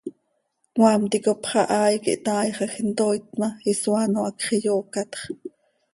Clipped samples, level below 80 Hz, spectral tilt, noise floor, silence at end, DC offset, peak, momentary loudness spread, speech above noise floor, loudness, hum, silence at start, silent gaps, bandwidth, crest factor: under 0.1%; -66 dBFS; -4.5 dB/octave; -72 dBFS; 0.45 s; under 0.1%; -4 dBFS; 13 LU; 50 dB; -23 LUFS; none; 0.05 s; none; 11.5 kHz; 20 dB